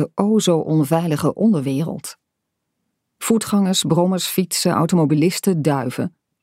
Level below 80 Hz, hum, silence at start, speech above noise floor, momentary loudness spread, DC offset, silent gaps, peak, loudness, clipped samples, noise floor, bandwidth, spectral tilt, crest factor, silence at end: -62 dBFS; none; 0 s; 59 dB; 10 LU; under 0.1%; none; -2 dBFS; -18 LUFS; under 0.1%; -77 dBFS; 16 kHz; -5.5 dB/octave; 18 dB; 0.35 s